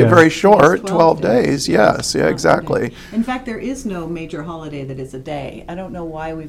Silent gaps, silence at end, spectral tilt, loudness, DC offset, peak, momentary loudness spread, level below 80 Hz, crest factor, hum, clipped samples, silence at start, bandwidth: none; 0 s; -5.5 dB/octave; -15 LUFS; under 0.1%; 0 dBFS; 18 LU; -42 dBFS; 16 dB; none; 0.2%; 0 s; 15.5 kHz